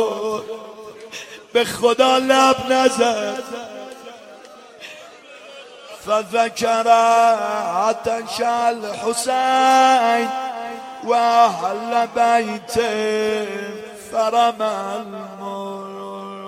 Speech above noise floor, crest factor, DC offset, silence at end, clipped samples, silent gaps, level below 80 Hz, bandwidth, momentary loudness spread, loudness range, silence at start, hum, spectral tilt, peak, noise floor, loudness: 24 dB; 18 dB; under 0.1%; 0 s; under 0.1%; none; -60 dBFS; 16 kHz; 21 LU; 6 LU; 0 s; none; -3 dB/octave; 0 dBFS; -42 dBFS; -18 LUFS